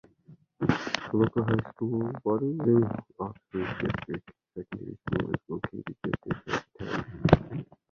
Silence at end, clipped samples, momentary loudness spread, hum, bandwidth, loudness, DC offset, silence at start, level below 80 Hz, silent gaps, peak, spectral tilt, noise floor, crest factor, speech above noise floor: 0.3 s; under 0.1%; 15 LU; none; 7.4 kHz; -30 LUFS; under 0.1%; 0.3 s; -50 dBFS; none; -2 dBFS; -7.5 dB/octave; -57 dBFS; 28 dB; 27 dB